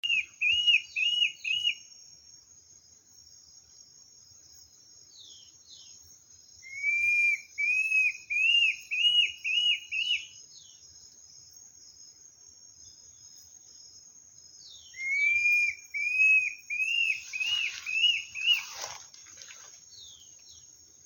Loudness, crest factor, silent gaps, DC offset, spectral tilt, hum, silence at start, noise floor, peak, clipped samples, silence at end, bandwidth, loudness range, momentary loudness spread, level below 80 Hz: -25 LUFS; 18 dB; none; under 0.1%; 3.5 dB/octave; none; 0.05 s; -57 dBFS; -12 dBFS; under 0.1%; 0.5 s; 17 kHz; 10 LU; 25 LU; -74 dBFS